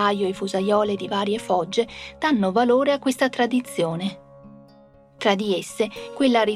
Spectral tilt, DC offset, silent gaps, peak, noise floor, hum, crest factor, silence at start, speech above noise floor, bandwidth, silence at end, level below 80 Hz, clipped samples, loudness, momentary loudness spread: -5 dB/octave; under 0.1%; none; -4 dBFS; -51 dBFS; none; 18 dB; 0 s; 30 dB; 14.5 kHz; 0 s; -58 dBFS; under 0.1%; -22 LUFS; 8 LU